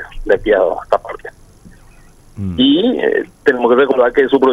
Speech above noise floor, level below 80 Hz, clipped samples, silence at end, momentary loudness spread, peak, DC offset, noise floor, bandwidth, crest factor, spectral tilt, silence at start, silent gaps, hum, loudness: 30 dB; -38 dBFS; under 0.1%; 0 s; 14 LU; 0 dBFS; under 0.1%; -43 dBFS; 11.5 kHz; 14 dB; -6.5 dB/octave; 0 s; none; none; -14 LUFS